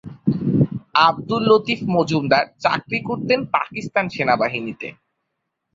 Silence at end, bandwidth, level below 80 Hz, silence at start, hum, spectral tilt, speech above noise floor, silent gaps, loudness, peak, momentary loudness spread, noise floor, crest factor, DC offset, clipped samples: 0.8 s; 7.8 kHz; -54 dBFS; 0.05 s; none; -6.5 dB/octave; 57 dB; none; -19 LUFS; 0 dBFS; 7 LU; -77 dBFS; 20 dB; under 0.1%; under 0.1%